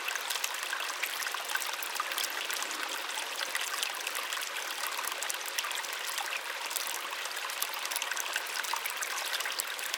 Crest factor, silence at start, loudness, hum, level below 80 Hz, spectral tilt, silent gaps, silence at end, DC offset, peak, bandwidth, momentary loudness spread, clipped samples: 28 dB; 0 s; -33 LUFS; none; under -90 dBFS; 3.5 dB/octave; none; 0 s; under 0.1%; -6 dBFS; 19 kHz; 2 LU; under 0.1%